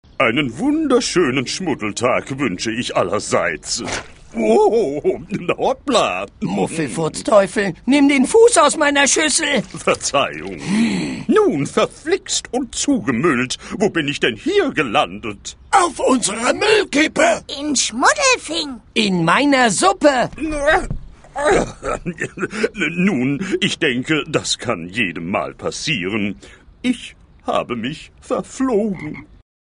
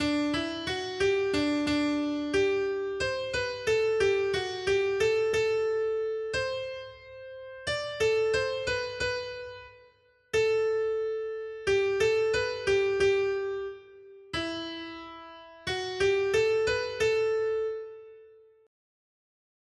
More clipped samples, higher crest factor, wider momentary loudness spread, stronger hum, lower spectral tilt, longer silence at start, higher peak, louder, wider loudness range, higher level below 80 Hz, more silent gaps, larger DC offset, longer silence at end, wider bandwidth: neither; about the same, 18 dB vs 14 dB; second, 11 LU vs 15 LU; neither; about the same, -3.5 dB/octave vs -4 dB/octave; first, 0.2 s vs 0 s; first, 0 dBFS vs -14 dBFS; first, -17 LUFS vs -28 LUFS; about the same, 6 LU vs 4 LU; first, -42 dBFS vs -56 dBFS; neither; neither; second, 0.4 s vs 1.4 s; about the same, 11 kHz vs 11.5 kHz